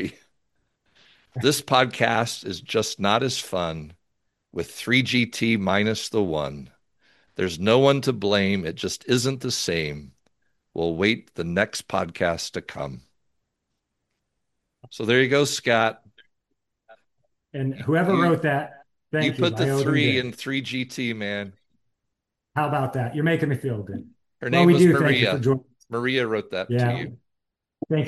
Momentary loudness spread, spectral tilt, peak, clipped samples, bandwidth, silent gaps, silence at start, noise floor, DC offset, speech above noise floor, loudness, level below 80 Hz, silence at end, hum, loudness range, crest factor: 14 LU; -5 dB/octave; -2 dBFS; under 0.1%; 12.5 kHz; none; 0 s; -81 dBFS; under 0.1%; 59 dB; -23 LUFS; -60 dBFS; 0 s; none; 6 LU; 22 dB